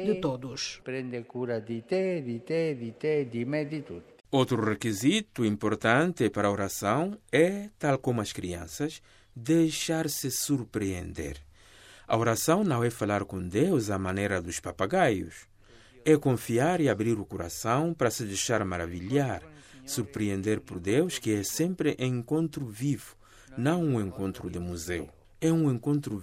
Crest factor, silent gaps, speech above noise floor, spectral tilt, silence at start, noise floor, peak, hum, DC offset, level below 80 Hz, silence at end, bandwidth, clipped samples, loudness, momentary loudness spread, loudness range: 20 dB; none; 27 dB; -5.5 dB/octave; 0 s; -55 dBFS; -8 dBFS; none; under 0.1%; -58 dBFS; 0 s; 16 kHz; under 0.1%; -29 LUFS; 11 LU; 4 LU